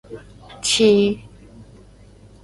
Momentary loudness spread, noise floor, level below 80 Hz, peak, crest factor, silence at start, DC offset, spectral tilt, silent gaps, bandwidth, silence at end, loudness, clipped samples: 25 LU; -46 dBFS; -48 dBFS; -4 dBFS; 18 dB; 0.1 s; under 0.1%; -3.5 dB/octave; none; 11.5 kHz; 0.8 s; -17 LUFS; under 0.1%